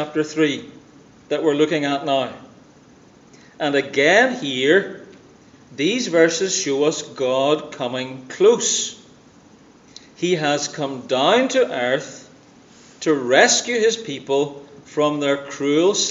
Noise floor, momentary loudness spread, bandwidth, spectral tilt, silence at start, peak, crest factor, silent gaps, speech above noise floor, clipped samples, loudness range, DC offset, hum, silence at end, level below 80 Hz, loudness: -49 dBFS; 12 LU; 8 kHz; -3 dB/octave; 0 s; 0 dBFS; 20 dB; none; 30 dB; under 0.1%; 3 LU; under 0.1%; none; 0 s; -68 dBFS; -19 LUFS